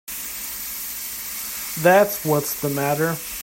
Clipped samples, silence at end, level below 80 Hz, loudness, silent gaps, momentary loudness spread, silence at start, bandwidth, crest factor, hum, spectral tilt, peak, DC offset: under 0.1%; 0 s; -54 dBFS; -22 LUFS; none; 12 LU; 0.05 s; 16.5 kHz; 20 dB; none; -4 dB/octave; -2 dBFS; under 0.1%